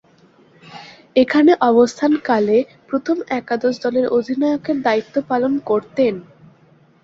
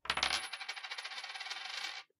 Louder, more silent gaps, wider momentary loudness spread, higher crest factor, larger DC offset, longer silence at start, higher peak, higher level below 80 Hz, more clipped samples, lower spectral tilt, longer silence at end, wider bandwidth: first, -17 LUFS vs -38 LUFS; neither; about the same, 10 LU vs 9 LU; second, 16 dB vs 28 dB; neither; first, 0.65 s vs 0.05 s; first, -2 dBFS vs -14 dBFS; first, -60 dBFS vs -66 dBFS; neither; first, -5.5 dB/octave vs 0.5 dB/octave; first, 0.8 s vs 0.15 s; second, 7.8 kHz vs 15.5 kHz